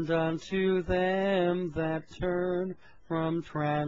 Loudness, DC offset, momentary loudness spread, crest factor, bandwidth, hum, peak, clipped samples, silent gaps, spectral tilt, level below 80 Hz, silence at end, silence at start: -30 LUFS; 0.2%; 7 LU; 14 dB; 7.6 kHz; none; -14 dBFS; under 0.1%; none; -7.5 dB/octave; -50 dBFS; 0 s; 0 s